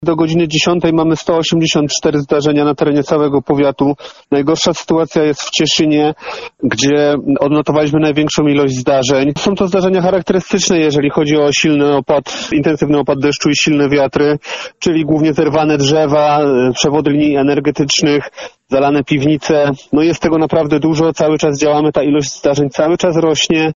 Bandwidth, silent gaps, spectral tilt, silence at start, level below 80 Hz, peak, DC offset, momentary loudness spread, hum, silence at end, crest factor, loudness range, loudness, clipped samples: 7.6 kHz; none; -4.5 dB/octave; 0 s; -44 dBFS; 0 dBFS; under 0.1%; 4 LU; none; 0 s; 12 dB; 1 LU; -13 LUFS; under 0.1%